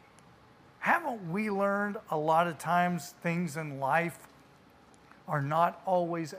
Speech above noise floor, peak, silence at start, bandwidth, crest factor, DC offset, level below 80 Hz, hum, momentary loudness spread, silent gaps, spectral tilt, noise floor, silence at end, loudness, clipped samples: 28 dB; -12 dBFS; 0.8 s; 15.5 kHz; 20 dB; under 0.1%; -74 dBFS; none; 7 LU; none; -6 dB/octave; -59 dBFS; 0 s; -30 LUFS; under 0.1%